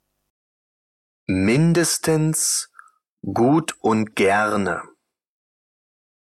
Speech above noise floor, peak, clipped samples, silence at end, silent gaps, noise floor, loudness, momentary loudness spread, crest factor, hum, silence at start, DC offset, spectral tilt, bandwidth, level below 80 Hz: 32 dB; -8 dBFS; under 0.1%; 1.55 s; 3.09-3.17 s; -51 dBFS; -20 LUFS; 11 LU; 14 dB; none; 1.3 s; under 0.1%; -4.5 dB/octave; 15 kHz; -58 dBFS